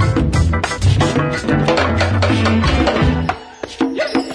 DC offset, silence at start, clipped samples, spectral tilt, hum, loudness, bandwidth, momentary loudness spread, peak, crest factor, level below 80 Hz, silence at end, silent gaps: under 0.1%; 0 s; under 0.1%; -6 dB/octave; none; -16 LUFS; 10.5 kHz; 6 LU; -2 dBFS; 12 dB; -26 dBFS; 0 s; none